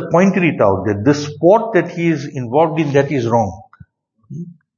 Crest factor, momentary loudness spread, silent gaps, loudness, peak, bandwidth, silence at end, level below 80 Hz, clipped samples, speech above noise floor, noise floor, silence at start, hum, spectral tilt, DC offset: 16 dB; 12 LU; none; -15 LUFS; 0 dBFS; 7.4 kHz; 0.25 s; -54 dBFS; under 0.1%; 32 dB; -47 dBFS; 0 s; none; -7 dB/octave; under 0.1%